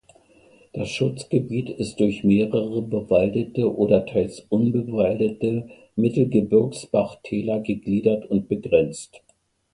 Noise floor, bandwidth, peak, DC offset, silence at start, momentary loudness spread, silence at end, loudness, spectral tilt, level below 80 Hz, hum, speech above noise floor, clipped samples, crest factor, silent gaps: -54 dBFS; 11 kHz; -4 dBFS; under 0.1%; 0.75 s; 9 LU; 0.7 s; -22 LUFS; -7.5 dB/octave; -52 dBFS; none; 33 dB; under 0.1%; 18 dB; none